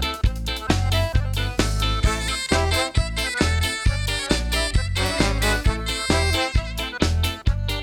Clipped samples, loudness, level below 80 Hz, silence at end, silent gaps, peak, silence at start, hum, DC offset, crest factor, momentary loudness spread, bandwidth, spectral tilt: under 0.1%; -22 LUFS; -26 dBFS; 0 s; none; -4 dBFS; 0 s; none; under 0.1%; 18 dB; 4 LU; 18 kHz; -4 dB/octave